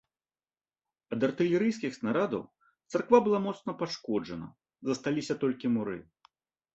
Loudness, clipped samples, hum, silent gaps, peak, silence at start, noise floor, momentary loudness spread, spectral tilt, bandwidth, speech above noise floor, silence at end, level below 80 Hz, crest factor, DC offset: -30 LUFS; under 0.1%; none; none; -10 dBFS; 1.1 s; under -90 dBFS; 14 LU; -6 dB/octave; 8.2 kHz; over 61 dB; 0.75 s; -70 dBFS; 22 dB; under 0.1%